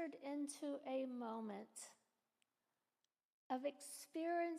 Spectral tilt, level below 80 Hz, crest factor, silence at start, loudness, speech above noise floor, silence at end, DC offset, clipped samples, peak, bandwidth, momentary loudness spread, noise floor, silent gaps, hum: -3.5 dB/octave; under -90 dBFS; 16 dB; 0 s; -47 LUFS; over 44 dB; 0 s; under 0.1%; under 0.1%; -32 dBFS; 15 kHz; 10 LU; under -90 dBFS; 3.25-3.50 s; none